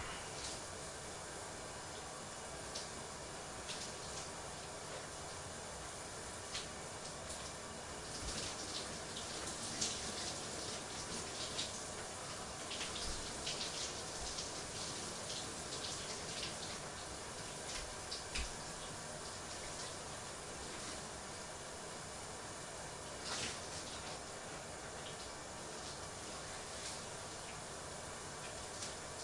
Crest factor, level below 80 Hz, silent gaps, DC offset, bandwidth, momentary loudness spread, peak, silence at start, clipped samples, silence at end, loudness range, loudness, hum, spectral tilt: 24 dB; -60 dBFS; none; under 0.1%; 12 kHz; 6 LU; -22 dBFS; 0 s; under 0.1%; 0 s; 4 LU; -44 LUFS; none; -2 dB/octave